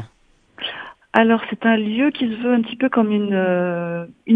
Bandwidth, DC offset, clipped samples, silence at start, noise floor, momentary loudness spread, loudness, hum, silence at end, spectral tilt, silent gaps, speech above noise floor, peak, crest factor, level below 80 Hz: 4.6 kHz; under 0.1%; under 0.1%; 0 s; -57 dBFS; 11 LU; -19 LUFS; none; 0 s; -8.5 dB/octave; none; 39 dB; 0 dBFS; 20 dB; -62 dBFS